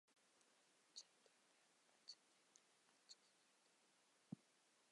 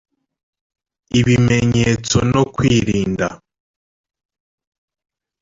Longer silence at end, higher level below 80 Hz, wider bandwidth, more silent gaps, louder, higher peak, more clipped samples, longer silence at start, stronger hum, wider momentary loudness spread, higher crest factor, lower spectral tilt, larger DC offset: second, 0 s vs 2.05 s; second, under -90 dBFS vs -40 dBFS; first, 11 kHz vs 7.8 kHz; neither; second, -64 LUFS vs -16 LUFS; second, -40 dBFS vs -2 dBFS; neither; second, 0.05 s vs 1.15 s; neither; about the same, 5 LU vs 7 LU; first, 30 dB vs 16 dB; second, -3 dB/octave vs -5.5 dB/octave; neither